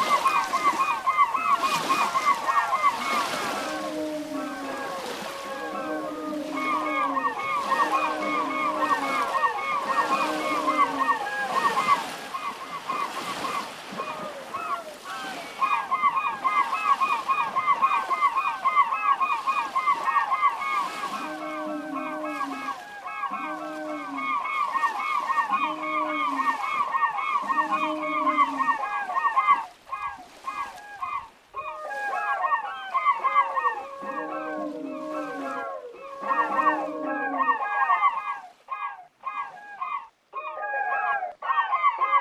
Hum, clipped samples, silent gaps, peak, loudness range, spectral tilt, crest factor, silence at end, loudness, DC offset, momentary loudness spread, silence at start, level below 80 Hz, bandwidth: none; under 0.1%; none; -8 dBFS; 7 LU; -2.5 dB/octave; 18 dB; 0 s; -26 LUFS; under 0.1%; 12 LU; 0 s; -70 dBFS; 15 kHz